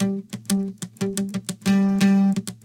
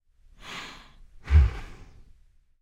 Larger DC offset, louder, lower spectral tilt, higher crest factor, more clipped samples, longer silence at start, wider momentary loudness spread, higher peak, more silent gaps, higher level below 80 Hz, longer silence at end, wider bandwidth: neither; first, -22 LUFS vs -26 LUFS; about the same, -6 dB/octave vs -6.5 dB/octave; about the same, 16 dB vs 20 dB; neither; second, 0 s vs 0.5 s; second, 11 LU vs 26 LU; about the same, -6 dBFS vs -8 dBFS; neither; second, -58 dBFS vs -28 dBFS; second, 0.1 s vs 0.9 s; first, 16.5 kHz vs 7.6 kHz